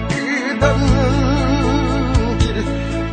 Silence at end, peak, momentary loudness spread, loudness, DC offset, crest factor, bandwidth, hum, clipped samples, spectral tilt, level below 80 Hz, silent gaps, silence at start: 0 s; -2 dBFS; 5 LU; -17 LUFS; under 0.1%; 14 dB; 9.2 kHz; none; under 0.1%; -6.5 dB/octave; -22 dBFS; none; 0 s